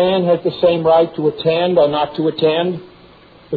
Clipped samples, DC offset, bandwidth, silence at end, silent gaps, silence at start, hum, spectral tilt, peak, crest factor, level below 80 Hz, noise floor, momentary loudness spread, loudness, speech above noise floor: under 0.1%; under 0.1%; 4.8 kHz; 0 s; none; 0 s; none; -9.5 dB/octave; -2 dBFS; 14 dB; -52 dBFS; -44 dBFS; 5 LU; -15 LUFS; 29 dB